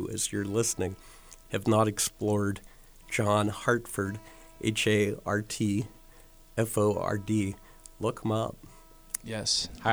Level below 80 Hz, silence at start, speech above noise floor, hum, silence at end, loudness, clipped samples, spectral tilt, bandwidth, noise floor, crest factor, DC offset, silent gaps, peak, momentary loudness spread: -54 dBFS; 0 s; 24 dB; none; 0 s; -29 LUFS; under 0.1%; -4.5 dB/octave; over 20 kHz; -53 dBFS; 24 dB; under 0.1%; none; -6 dBFS; 11 LU